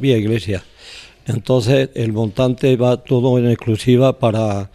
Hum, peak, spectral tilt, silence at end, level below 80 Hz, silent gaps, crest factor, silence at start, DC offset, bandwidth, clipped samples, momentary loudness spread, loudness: none; -2 dBFS; -7.5 dB/octave; 0.1 s; -46 dBFS; none; 14 dB; 0 s; under 0.1%; 13 kHz; under 0.1%; 12 LU; -16 LUFS